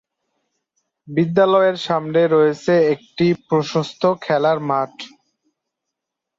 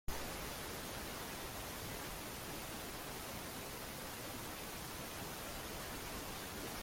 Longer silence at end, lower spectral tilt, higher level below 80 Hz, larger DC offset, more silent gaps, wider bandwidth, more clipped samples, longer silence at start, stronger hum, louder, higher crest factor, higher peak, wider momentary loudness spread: first, 1.3 s vs 0 s; first, -6.5 dB/octave vs -3 dB/octave; second, -62 dBFS vs -56 dBFS; neither; neither; second, 7.8 kHz vs 16.5 kHz; neither; first, 1.05 s vs 0.1 s; neither; first, -18 LUFS vs -45 LUFS; about the same, 16 dB vs 18 dB; first, -2 dBFS vs -28 dBFS; first, 8 LU vs 1 LU